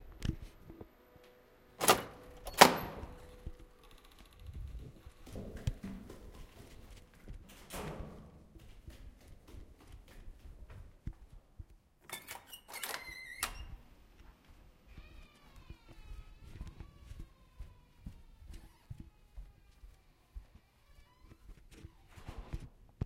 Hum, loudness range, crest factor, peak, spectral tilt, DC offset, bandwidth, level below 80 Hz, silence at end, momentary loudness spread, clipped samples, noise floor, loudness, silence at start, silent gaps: none; 25 LU; 38 dB; -2 dBFS; -3 dB/octave; under 0.1%; 16 kHz; -54 dBFS; 0 s; 18 LU; under 0.1%; -63 dBFS; -34 LUFS; 0 s; none